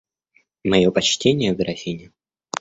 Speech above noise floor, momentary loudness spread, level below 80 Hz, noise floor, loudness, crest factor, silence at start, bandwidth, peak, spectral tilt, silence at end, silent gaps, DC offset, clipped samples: 44 dB; 14 LU; -50 dBFS; -63 dBFS; -20 LUFS; 20 dB; 0.65 s; 8 kHz; -2 dBFS; -4.5 dB/octave; 0.55 s; none; under 0.1%; under 0.1%